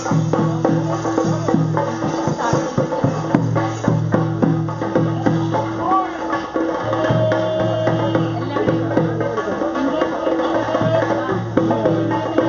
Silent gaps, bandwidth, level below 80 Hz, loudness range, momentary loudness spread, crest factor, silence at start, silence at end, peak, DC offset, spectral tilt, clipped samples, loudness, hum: none; 7.4 kHz; -48 dBFS; 0 LU; 3 LU; 18 dB; 0 s; 0 s; 0 dBFS; under 0.1%; -6.5 dB/octave; under 0.1%; -19 LUFS; none